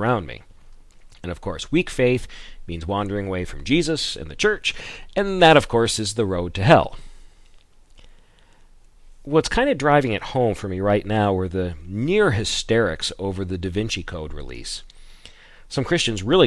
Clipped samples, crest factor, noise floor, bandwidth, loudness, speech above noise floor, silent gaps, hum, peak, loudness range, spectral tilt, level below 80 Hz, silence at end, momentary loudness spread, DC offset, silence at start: under 0.1%; 22 dB; -51 dBFS; 12 kHz; -21 LUFS; 30 dB; none; none; 0 dBFS; 7 LU; -5 dB/octave; -40 dBFS; 0 s; 17 LU; under 0.1%; 0 s